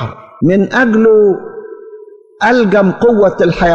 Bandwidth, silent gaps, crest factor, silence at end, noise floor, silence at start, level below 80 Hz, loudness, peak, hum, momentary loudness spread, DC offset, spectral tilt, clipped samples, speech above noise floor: 7.4 kHz; none; 10 dB; 0 s; -35 dBFS; 0 s; -38 dBFS; -10 LUFS; -2 dBFS; none; 17 LU; 0.3%; -7.5 dB/octave; under 0.1%; 26 dB